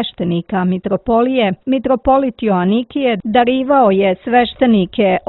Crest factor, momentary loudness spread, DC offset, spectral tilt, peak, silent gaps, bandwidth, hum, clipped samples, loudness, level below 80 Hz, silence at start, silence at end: 14 dB; 5 LU; under 0.1%; -11 dB/octave; 0 dBFS; none; 4.2 kHz; none; under 0.1%; -14 LUFS; -42 dBFS; 0 s; 0.1 s